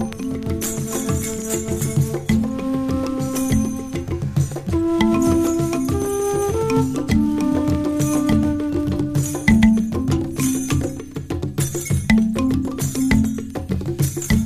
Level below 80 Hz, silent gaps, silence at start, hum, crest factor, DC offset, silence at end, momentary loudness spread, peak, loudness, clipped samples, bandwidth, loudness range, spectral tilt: -34 dBFS; none; 0 s; none; 18 dB; under 0.1%; 0 s; 8 LU; 0 dBFS; -20 LUFS; under 0.1%; 15.5 kHz; 3 LU; -6 dB/octave